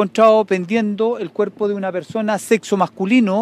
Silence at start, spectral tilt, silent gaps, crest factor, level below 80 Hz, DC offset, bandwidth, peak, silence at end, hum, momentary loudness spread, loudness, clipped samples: 0 s; -6 dB/octave; none; 14 dB; -70 dBFS; under 0.1%; 14.5 kHz; -2 dBFS; 0 s; none; 10 LU; -18 LUFS; under 0.1%